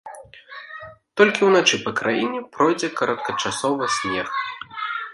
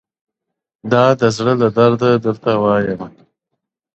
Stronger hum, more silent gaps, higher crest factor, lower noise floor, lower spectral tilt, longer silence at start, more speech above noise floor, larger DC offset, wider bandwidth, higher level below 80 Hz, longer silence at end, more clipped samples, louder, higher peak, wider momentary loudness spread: neither; neither; first, 22 dB vs 16 dB; second, -41 dBFS vs -80 dBFS; second, -3 dB/octave vs -6.5 dB/octave; second, 0.05 s vs 0.85 s; second, 20 dB vs 66 dB; neither; first, 11.5 kHz vs 8.2 kHz; second, -62 dBFS vs -54 dBFS; second, 0 s vs 0.85 s; neither; second, -21 LUFS vs -15 LUFS; about the same, 0 dBFS vs 0 dBFS; first, 21 LU vs 12 LU